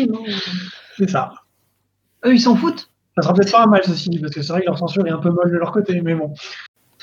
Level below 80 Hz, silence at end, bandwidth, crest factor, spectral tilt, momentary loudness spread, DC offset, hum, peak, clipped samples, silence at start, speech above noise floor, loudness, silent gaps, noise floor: -68 dBFS; 0.35 s; 7.4 kHz; 18 dB; -6.5 dB/octave; 16 LU; under 0.1%; none; 0 dBFS; under 0.1%; 0 s; 50 dB; -18 LUFS; none; -67 dBFS